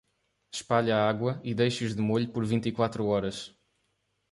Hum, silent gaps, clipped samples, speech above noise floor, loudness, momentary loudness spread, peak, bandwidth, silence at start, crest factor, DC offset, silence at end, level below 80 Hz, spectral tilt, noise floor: none; none; under 0.1%; 48 dB; -28 LUFS; 13 LU; -10 dBFS; 11.5 kHz; 0.55 s; 20 dB; under 0.1%; 0.85 s; -60 dBFS; -6 dB/octave; -76 dBFS